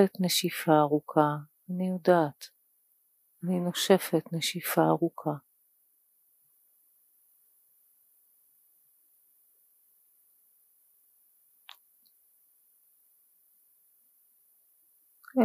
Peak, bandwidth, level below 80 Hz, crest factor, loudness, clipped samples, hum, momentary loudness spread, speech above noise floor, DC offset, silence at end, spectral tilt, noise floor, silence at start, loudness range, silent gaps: -8 dBFS; 15.5 kHz; -88 dBFS; 24 dB; -28 LUFS; under 0.1%; none; 14 LU; 43 dB; under 0.1%; 0 s; -5 dB/octave; -70 dBFS; 0 s; 8 LU; none